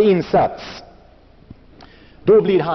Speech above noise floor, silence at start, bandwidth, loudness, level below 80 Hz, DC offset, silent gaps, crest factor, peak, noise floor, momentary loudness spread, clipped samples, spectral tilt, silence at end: 32 dB; 0 s; 6.2 kHz; -16 LUFS; -48 dBFS; under 0.1%; none; 14 dB; -4 dBFS; -47 dBFS; 21 LU; under 0.1%; -6 dB/octave; 0 s